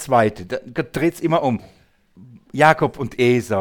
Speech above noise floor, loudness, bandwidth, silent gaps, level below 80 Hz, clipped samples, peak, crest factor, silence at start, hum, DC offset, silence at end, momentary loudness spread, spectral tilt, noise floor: 30 dB; -19 LUFS; 18.5 kHz; none; -50 dBFS; under 0.1%; 0 dBFS; 20 dB; 0 s; none; under 0.1%; 0 s; 12 LU; -6 dB/octave; -49 dBFS